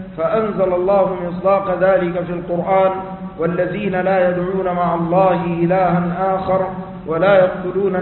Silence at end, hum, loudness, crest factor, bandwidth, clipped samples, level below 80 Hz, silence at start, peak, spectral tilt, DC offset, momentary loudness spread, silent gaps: 0 s; none; -17 LUFS; 14 dB; 4.3 kHz; under 0.1%; -44 dBFS; 0 s; -2 dBFS; -12.5 dB/octave; under 0.1%; 7 LU; none